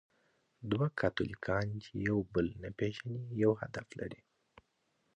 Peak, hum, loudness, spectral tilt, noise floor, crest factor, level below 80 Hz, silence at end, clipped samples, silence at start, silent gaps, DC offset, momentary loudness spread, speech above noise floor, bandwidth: -16 dBFS; none; -36 LUFS; -7.5 dB/octave; -78 dBFS; 20 dB; -58 dBFS; 1 s; under 0.1%; 0.6 s; none; under 0.1%; 13 LU; 43 dB; 9.4 kHz